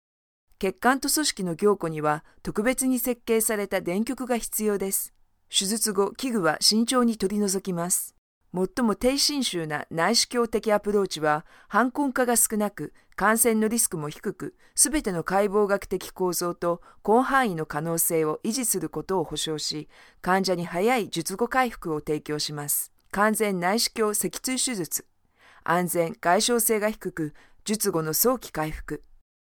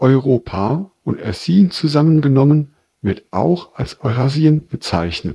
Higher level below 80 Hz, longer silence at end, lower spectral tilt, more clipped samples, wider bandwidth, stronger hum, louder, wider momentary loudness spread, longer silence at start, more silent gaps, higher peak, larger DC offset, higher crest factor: second, -52 dBFS vs -44 dBFS; first, 0.6 s vs 0 s; second, -3 dB/octave vs -8 dB/octave; neither; first, 19 kHz vs 11 kHz; neither; second, -25 LUFS vs -16 LUFS; about the same, 10 LU vs 10 LU; first, 0.6 s vs 0 s; first, 8.18-8.41 s vs none; second, -4 dBFS vs 0 dBFS; neither; first, 22 dB vs 16 dB